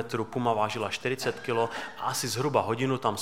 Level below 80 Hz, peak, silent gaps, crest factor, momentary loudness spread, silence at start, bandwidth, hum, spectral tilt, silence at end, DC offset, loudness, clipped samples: -66 dBFS; -8 dBFS; none; 20 dB; 5 LU; 0 s; 16.5 kHz; none; -4.5 dB/octave; 0 s; 0.3%; -29 LUFS; under 0.1%